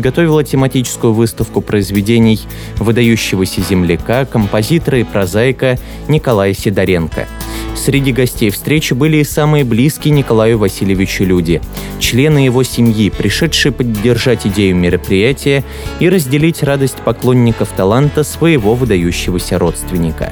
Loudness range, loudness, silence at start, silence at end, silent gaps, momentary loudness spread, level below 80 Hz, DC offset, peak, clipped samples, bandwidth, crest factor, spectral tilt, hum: 2 LU; -12 LUFS; 0 s; 0 s; none; 5 LU; -28 dBFS; under 0.1%; 0 dBFS; under 0.1%; over 20 kHz; 12 dB; -6 dB/octave; none